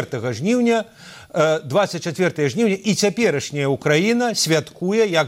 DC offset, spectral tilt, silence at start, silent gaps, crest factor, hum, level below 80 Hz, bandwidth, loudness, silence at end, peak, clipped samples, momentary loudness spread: under 0.1%; -4.5 dB/octave; 0 s; none; 16 dB; none; -62 dBFS; 16 kHz; -19 LUFS; 0 s; -4 dBFS; under 0.1%; 5 LU